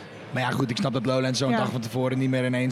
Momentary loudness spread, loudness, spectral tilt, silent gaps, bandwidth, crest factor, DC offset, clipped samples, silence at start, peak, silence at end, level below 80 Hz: 4 LU; -25 LUFS; -6 dB/octave; none; 14.5 kHz; 16 dB; under 0.1%; under 0.1%; 0 s; -10 dBFS; 0 s; -66 dBFS